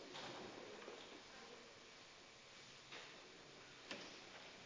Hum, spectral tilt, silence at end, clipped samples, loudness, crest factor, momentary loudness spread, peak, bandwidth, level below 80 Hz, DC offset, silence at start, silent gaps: none; -2.5 dB/octave; 0 s; under 0.1%; -56 LUFS; 22 dB; 7 LU; -34 dBFS; 8 kHz; -86 dBFS; under 0.1%; 0 s; none